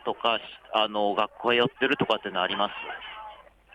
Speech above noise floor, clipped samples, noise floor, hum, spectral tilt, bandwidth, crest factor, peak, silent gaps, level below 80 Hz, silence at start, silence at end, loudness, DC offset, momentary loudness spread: 21 dB; under 0.1%; -47 dBFS; none; -5.5 dB/octave; 9.8 kHz; 18 dB; -10 dBFS; none; -66 dBFS; 0.05 s; 0.35 s; -26 LUFS; under 0.1%; 14 LU